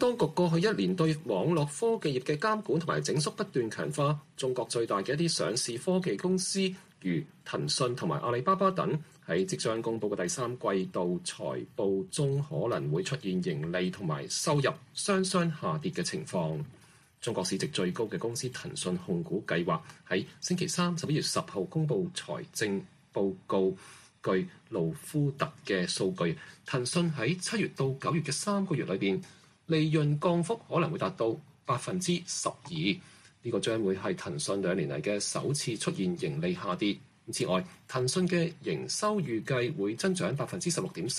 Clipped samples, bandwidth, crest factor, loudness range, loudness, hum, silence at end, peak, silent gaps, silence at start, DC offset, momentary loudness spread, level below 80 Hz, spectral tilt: under 0.1%; 13.5 kHz; 16 dB; 3 LU; -31 LUFS; none; 0 s; -14 dBFS; none; 0 s; under 0.1%; 6 LU; -68 dBFS; -5 dB/octave